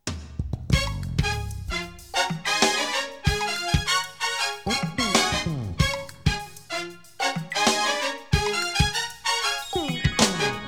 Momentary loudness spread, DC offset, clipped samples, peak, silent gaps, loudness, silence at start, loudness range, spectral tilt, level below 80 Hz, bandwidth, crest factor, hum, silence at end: 10 LU; 0.3%; under 0.1%; -4 dBFS; none; -25 LUFS; 0.05 s; 2 LU; -3.5 dB/octave; -36 dBFS; 20 kHz; 22 dB; none; 0 s